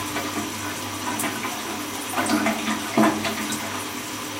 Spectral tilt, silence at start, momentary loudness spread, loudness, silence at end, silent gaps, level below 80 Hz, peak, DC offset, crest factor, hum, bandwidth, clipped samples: -3 dB/octave; 0 s; 8 LU; -25 LUFS; 0 s; none; -60 dBFS; -6 dBFS; under 0.1%; 20 dB; none; 16 kHz; under 0.1%